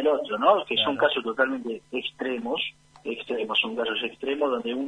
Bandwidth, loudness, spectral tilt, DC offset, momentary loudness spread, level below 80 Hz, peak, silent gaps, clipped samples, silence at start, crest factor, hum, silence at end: 10 kHz; -26 LUFS; -4.5 dB/octave; under 0.1%; 11 LU; -68 dBFS; -6 dBFS; none; under 0.1%; 0 s; 20 dB; none; 0 s